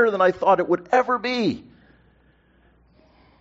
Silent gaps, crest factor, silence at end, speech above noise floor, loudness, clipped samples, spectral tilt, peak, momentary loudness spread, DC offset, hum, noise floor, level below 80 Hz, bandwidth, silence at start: none; 18 dB; 1.8 s; 38 dB; -21 LUFS; under 0.1%; -3.5 dB/octave; -4 dBFS; 7 LU; under 0.1%; none; -59 dBFS; -60 dBFS; 7.6 kHz; 0 s